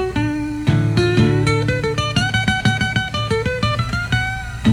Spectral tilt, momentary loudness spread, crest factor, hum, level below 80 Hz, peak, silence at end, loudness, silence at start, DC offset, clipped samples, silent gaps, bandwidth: -5.5 dB/octave; 5 LU; 14 dB; none; -34 dBFS; -4 dBFS; 0 s; -18 LUFS; 0 s; under 0.1%; under 0.1%; none; 12.5 kHz